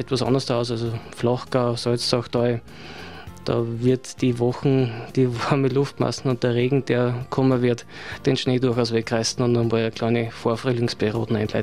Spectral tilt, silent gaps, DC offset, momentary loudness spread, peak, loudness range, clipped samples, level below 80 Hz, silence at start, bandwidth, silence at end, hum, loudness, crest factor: -6 dB/octave; none; 0.5%; 6 LU; -4 dBFS; 2 LU; under 0.1%; -52 dBFS; 0 s; 13 kHz; 0 s; none; -23 LUFS; 18 dB